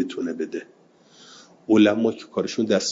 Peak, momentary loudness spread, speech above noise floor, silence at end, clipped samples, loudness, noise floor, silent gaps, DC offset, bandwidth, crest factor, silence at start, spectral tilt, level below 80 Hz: -6 dBFS; 15 LU; 31 dB; 0 s; under 0.1%; -22 LUFS; -52 dBFS; none; under 0.1%; 7.8 kHz; 18 dB; 0 s; -4.5 dB/octave; -68 dBFS